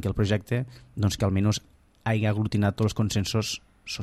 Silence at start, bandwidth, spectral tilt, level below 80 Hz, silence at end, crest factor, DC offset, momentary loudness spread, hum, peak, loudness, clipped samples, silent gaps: 0 s; 13.5 kHz; -5.5 dB/octave; -46 dBFS; 0 s; 16 dB; under 0.1%; 9 LU; none; -10 dBFS; -27 LUFS; under 0.1%; none